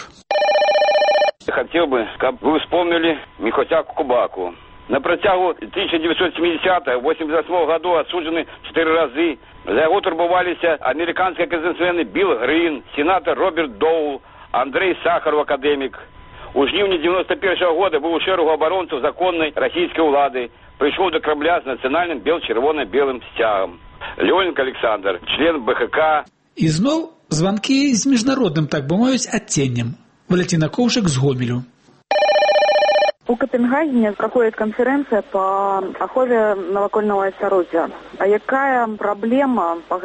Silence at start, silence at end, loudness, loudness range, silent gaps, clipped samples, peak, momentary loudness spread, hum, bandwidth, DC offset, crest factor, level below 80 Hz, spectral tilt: 0 s; 0 s; -18 LUFS; 2 LU; none; under 0.1%; -4 dBFS; 6 LU; none; 8.4 kHz; under 0.1%; 14 dB; -50 dBFS; -5 dB/octave